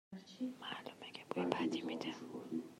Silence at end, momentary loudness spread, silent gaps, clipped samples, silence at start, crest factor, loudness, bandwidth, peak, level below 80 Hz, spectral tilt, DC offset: 0 s; 12 LU; none; under 0.1%; 0.1 s; 26 dB; -43 LUFS; 15 kHz; -18 dBFS; -86 dBFS; -5 dB/octave; under 0.1%